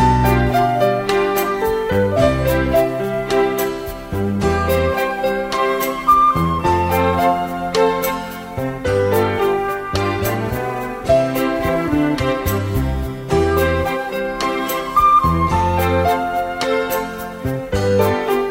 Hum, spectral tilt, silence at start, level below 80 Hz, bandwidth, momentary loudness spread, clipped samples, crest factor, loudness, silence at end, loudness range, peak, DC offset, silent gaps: none; -6 dB/octave; 0 s; -32 dBFS; 16.5 kHz; 8 LU; under 0.1%; 14 dB; -18 LUFS; 0 s; 2 LU; -2 dBFS; under 0.1%; none